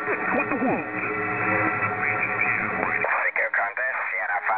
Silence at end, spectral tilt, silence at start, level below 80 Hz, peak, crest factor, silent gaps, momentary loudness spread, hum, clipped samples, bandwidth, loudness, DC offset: 0 s; -5 dB/octave; 0 s; -58 dBFS; -4 dBFS; 20 dB; none; 3 LU; none; under 0.1%; 4 kHz; -23 LUFS; 0.1%